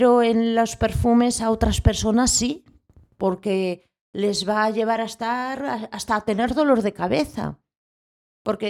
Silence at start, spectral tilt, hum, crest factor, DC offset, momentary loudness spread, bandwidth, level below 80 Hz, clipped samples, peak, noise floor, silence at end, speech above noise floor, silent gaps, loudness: 0 s; -4.5 dB/octave; none; 20 dB; under 0.1%; 10 LU; 15 kHz; -36 dBFS; under 0.1%; -2 dBFS; -54 dBFS; 0 s; 34 dB; 4.01-4.13 s, 7.77-8.45 s; -22 LUFS